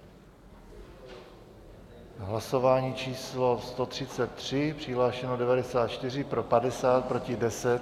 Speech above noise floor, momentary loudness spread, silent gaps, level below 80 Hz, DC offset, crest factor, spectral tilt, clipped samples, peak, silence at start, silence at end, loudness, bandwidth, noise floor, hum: 24 dB; 22 LU; none; -56 dBFS; under 0.1%; 20 dB; -5.5 dB/octave; under 0.1%; -10 dBFS; 0 s; 0 s; -29 LUFS; 14 kHz; -52 dBFS; none